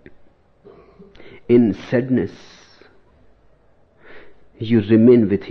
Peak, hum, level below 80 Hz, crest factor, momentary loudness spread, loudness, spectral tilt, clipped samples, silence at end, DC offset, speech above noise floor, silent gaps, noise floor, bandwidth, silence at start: -2 dBFS; none; -56 dBFS; 18 dB; 10 LU; -16 LUFS; -9.5 dB/octave; under 0.1%; 0 s; under 0.1%; 38 dB; none; -54 dBFS; 6.2 kHz; 1.2 s